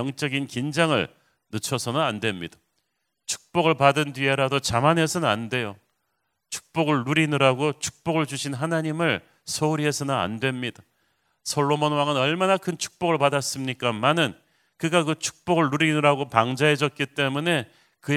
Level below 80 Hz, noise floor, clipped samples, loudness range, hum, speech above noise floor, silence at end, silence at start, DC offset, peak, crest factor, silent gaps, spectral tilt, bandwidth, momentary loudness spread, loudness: -58 dBFS; -76 dBFS; under 0.1%; 3 LU; none; 53 dB; 0 s; 0 s; under 0.1%; 0 dBFS; 24 dB; none; -4.5 dB/octave; 16 kHz; 11 LU; -23 LUFS